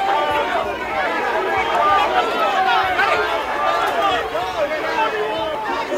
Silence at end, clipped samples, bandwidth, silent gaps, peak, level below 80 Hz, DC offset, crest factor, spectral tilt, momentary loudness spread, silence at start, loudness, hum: 0 s; under 0.1%; 16 kHz; none; -4 dBFS; -48 dBFS; under 0.1%; 14 dB; -3 dB/octave; 6 LU; 0 s; -19 LUFS; none